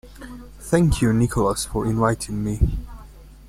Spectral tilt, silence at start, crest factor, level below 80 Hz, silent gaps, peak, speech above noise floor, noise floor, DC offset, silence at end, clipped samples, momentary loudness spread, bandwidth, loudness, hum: -6 dB/octave; 0.05 s; 18 dB; -32 dBFS; none; -4 dBFS; 22 dB; -42 dBFS; under 0.1%; 0 s; under 0.1%; 21 LU; 16 kHz; -21 LUFS; none